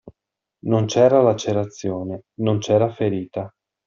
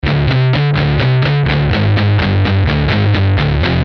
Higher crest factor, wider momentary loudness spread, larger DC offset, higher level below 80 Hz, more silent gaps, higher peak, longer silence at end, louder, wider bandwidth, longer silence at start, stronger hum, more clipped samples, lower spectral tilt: first, 18 dB vs 10 dB; first, 16 LU vs 1 LU; neither; second, -60 dBFS vs -24 dBFS; neither; about the same, -4 dBFS vs -2 dBFS; first, 0.4 s vs 0 s; second, -20 LUFS vs -13 LUFS; first, 7.6 kHz vs 6 kHz; about the same, 0.05 s vs 0.05 s; neither; neither; second, -6.5 dB/octave vs -8.5 dB/octave